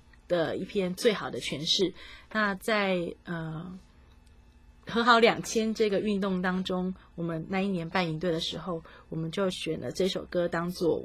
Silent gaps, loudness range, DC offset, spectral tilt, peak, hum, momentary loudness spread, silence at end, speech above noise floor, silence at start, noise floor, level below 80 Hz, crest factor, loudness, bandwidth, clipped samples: none; 4 LU; under 0.1%; -5 dB/octave; -8 dBFS; none; 11 LU; 0 s; 27 dB; 0.3 s; -56 dBFS; -56 dBFS; 22 dB; -29 LUFS; 15.5 kHz; under 0.1%